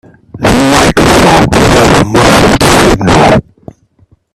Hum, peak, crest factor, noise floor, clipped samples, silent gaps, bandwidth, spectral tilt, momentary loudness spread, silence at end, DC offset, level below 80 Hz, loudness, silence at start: none; 0 dBFS; 6 dB; -47 dBFS; 0.7%; none; 17 kHz; -4.5 dB/octave; 3 LU; 0.95 s; under 0.1%; -22 dBFS; -6 LUFS; 0.35 s